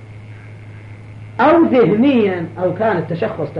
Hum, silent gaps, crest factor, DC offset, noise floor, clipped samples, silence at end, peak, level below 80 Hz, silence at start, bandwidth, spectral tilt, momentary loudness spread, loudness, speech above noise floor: none; none; 12 dB; under 0.1%; -35 dBFS; under 0.1%; 0 s; -4 dBFS; -52 dBFS; 0 s; 5.8 kHz; -9 dB/octave; 24 LU; -15 LUFS; 20 dB